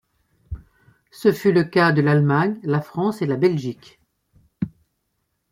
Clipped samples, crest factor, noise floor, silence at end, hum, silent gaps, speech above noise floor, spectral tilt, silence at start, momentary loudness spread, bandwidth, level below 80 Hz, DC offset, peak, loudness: under 0.1%; 18 dB; -73 dBFS; 0.8 s; none; none; 54 dB; -8 dB/octave; 0.5 s; 21 LU; 15.5 kHz; -50 dBFS; under 0.1%; -4 dBFS; -20 LUFS